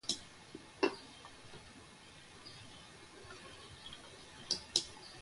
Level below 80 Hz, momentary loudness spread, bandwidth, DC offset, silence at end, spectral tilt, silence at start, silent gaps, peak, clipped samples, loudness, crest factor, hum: -70 dBFS; 19 LU; 11.5 kHz; under 0.1%; 0 s; -2 dB/octave; 0.05 s; none; -12 dBFS; under 0.1%; -41 LUFS; 32 dB; none